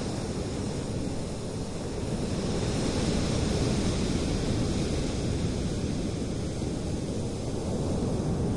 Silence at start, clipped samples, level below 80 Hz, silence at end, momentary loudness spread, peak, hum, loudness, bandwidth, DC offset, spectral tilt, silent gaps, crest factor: 0 s; under 0.1%; -38 dBFS; 0 s; 5 LU; -14 dBFS; none; -30 LUFS; 11.5 kHz; under 0.1%; -6 dB/octave; none; 14 dB